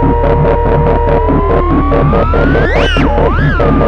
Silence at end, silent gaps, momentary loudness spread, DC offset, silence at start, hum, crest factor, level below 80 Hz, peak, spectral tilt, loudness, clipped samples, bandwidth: 0 s; none; 1 LU; under 0.1%; 0 s; none; 6 dB; -14 dBFS; -2 dBFS; -8 dB/octave; -10 LUFS; under 0.1%; 6.4 kHz